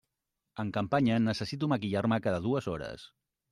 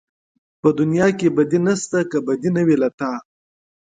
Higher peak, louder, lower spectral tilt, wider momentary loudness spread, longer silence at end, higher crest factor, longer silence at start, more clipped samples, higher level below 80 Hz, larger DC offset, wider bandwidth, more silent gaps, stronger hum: second, -16 dBFS vs -4 dBFS; second, -31 LUFS vs -19 LUFS; about the same, -7 dB/octave vs -6.5 dB/octave; first, 13 LU vs 6 LU; second, 0.45 s vs 0.75 s; about the same, 16 dB vs 16 dB; about the same, 0.55 s vs 0.65 s; neither; about the same, -62 dBFS vs -60 dBFS; neither; first, 11.5 kHz vs 9.6 kHz; second, none vs 2.94-2.98 s; neither